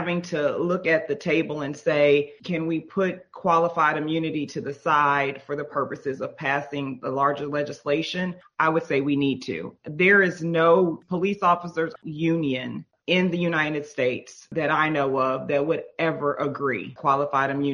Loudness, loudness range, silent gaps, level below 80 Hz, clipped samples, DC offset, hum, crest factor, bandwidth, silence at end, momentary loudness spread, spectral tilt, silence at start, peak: -24 LUFS; 4 LU; none; -66 dBFS; under 0.1%; under 0.1%; none; 18 dB; 10.5 kHz; 0 s; 10 LU; -6.5 dB/octave; 0 s; -6 dBFS